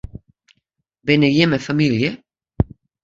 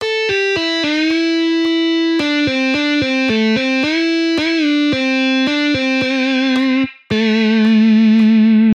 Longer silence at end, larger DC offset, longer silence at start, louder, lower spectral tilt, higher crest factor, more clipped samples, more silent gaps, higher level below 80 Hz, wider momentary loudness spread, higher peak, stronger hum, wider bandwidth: first, 0.4 s vs 0 s; neither; first, 0.15 s vs 0 s; second, -18 LUFS vs -14 LUFS; first, -6.5 dB/octave vs -5 dB/octave; first, 20 dB vs 8 dB; neither; neither; first, -38 dBFS vs -54 dBFS; first, 14 LU vs 5 LU; first, 0 dBFS vs -6 dBFS; neither; second, 7.8 kHz vs 8.8 kHz